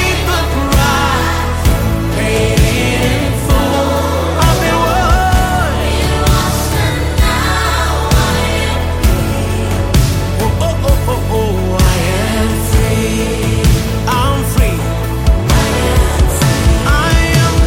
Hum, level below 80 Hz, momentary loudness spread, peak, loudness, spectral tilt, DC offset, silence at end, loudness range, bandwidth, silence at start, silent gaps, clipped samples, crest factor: none; -16 dBFS; 3 LU; 0 dBFS; -13 LUFS; -5 dB/octave; under 0.1%; 0 s; 1 LU; 17 kHz; 0 s; none; under 0.1%; 12 dB